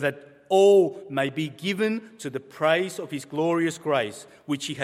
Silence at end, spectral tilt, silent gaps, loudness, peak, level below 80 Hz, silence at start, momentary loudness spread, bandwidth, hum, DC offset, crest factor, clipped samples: 0 s; -5 dB/octave; none; -24 LUFS; -8 dBFS; -74 dBFS; 0 s; 15 LU; 14.5 kHz; none; under 0.1%; 18 dB; under 0.1%